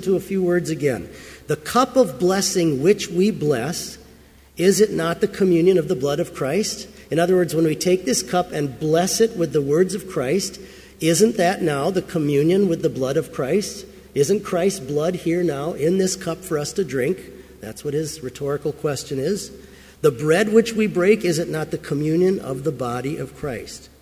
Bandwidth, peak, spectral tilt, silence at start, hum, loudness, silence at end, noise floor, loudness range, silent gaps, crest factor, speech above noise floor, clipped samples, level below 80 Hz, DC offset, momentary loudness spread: 16 kHz; -4 dBFS; -5 dB/octave; 0 s; none; -21 LUFS; 0.15 s; -48 dBFS; 4 LU; none; 18 dB; 28 dB; under 0.1%; -50 dBFS; under 0.1%; 11 LU